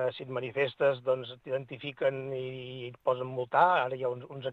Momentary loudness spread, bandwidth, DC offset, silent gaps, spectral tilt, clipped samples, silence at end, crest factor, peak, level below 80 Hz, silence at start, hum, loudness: 12 LU; 5.4 kHz; under 0.1%; none; -7.5 dB/octave; under 0.1%; 0 s; 22 dB; -10 dBFS; -74 dBFS; 0 s; none; -31 LUFS